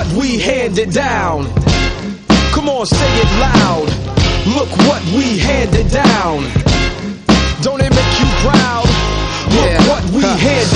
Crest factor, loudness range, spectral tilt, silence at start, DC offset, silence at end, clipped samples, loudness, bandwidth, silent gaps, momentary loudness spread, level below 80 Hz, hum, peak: 12 dB; 1 LU; -5 dB/octave; 0 s; under 0.1%; 0 s; under 0.1%; -13 LUFS; 11 kHz; none; 5 LU; -20 dBFS; none; 0 dBFS